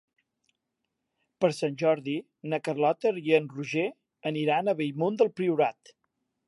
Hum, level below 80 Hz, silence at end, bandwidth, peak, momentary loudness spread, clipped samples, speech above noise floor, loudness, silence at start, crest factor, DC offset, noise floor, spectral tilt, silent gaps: none; -82 dBFS; 0.75 s; 11.5 kHz; -10 dBFS; 8 LU; under 0.1%; 56 dB; -28 LUFS; 1.4 s; 20 dB; under 0.1%; -83 dBFS; -6.5 dB/octave; none